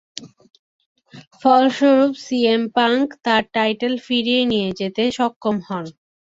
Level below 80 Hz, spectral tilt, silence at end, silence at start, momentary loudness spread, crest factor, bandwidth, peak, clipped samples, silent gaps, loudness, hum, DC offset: -60 dBFS; -5 dB/octave; 0.45 s; 0.15 s; 11 LU; 18 dB; 7.8 kHz; -2 dBFS; under 0.1%; 0.59-0.79 s, 0.86-0.95 s, 1.27-1.31 s, 5.36-5.41 s; -18 LUFS; none; under 0.1%